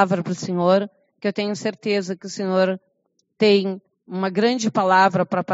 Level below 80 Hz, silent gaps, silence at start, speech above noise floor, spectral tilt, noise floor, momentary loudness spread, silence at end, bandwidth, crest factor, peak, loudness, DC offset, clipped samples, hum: -72 dBFS; none; 0 s; 50 dB; -4.5 dB/octave; -70 dBFS; 12 LU; 0 s; 8 kHz; 20 dB; -2 dBFS; -21 LUFS; under 0.1%; under 0.1%; none